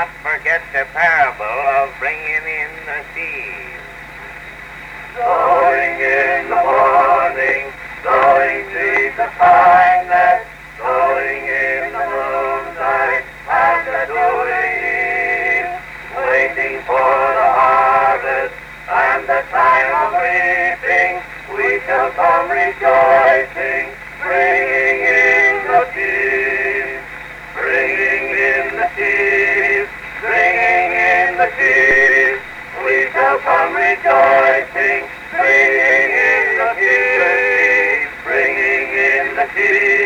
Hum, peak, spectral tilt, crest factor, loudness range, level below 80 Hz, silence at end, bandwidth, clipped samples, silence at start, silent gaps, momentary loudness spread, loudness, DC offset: none; -2 dBFS; -4 dB/octave; 14 dB; 5 LU; -46 dBFS; 0 s; 14.5 kHz; under 0.1%; 0 s; none; 13 LU; -14 LUFS; under 0.1%